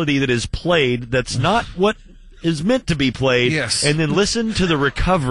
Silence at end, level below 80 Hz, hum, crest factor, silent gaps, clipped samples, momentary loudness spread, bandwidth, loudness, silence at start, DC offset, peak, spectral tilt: 0 s; -34 dBFS; none; 14 dB; none; under 0.1%; 4 LU; 11.5 kHz; -18 LUFS; 0 s; 0.3%; -4 dBFS; -4.5 dB/octave